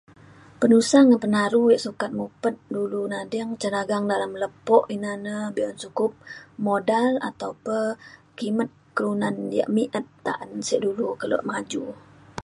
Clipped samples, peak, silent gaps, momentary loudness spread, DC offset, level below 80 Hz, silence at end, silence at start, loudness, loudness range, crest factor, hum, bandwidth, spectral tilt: under 0.1%; -2 dBFS; none; 12 LU; under 0.1%; -66 dBFS; 0.05 s; 0.6 s; -24 LUFS; 6 LU; 22 dB; none; 11.5 kHz; -5 dB/octave